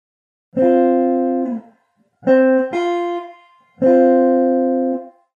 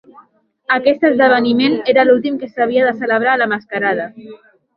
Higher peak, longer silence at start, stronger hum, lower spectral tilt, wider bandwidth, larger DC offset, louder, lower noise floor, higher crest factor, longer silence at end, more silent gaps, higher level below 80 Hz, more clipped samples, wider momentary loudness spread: about the same, -2 dBFS vs 0 dBFS; second, 0.55 s vs 0.7 s; neither; about the same, -7.5 dB/octave vs -8 dB/octave; first, 7 kHz vs 5.6 kHz; neither; about the same, -16 LUFS vs -14 LUFS; first, -61 dBFS vs -50 dBFS; about the same, 14 dB vs 14 dB; about the same, 0.3 s vs 0.4 s; neither; second, -76 dBFS vs -62 dBFS; neither; first, 12 LU vs 8 LU